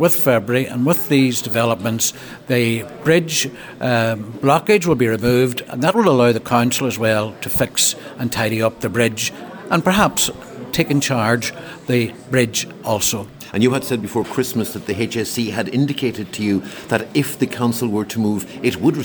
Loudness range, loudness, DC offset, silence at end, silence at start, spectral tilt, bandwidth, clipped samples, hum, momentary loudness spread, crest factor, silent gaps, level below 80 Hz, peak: 4 LU; -18 LUFS; under 0.1%; 0 s; 0 s; -4.5 dB/octave; over 20 kHz; under 0.1%; none; 8 LU; 16 dB; none; -50 dBFS; -2 dBFS